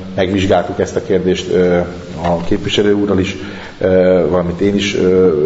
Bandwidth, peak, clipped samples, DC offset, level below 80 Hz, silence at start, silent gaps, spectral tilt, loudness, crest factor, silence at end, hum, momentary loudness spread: 8 kHz; 0 dBFS; under 0.1%; under 0.1%; -36 dBFS; 0 s; none; -6 dB/octave; -14 LUFS; 12 dB; 0 s; none; 8 LU